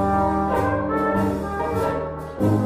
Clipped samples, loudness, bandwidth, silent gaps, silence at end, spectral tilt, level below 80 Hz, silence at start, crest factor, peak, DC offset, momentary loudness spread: under 0.1%; -23 LUFS; 15.5 kHz; none; 0 s; -8 dB/octave; -38 dBFS; 0 s; 12 dB; -8 dBFS; under 0.1%; 5 LU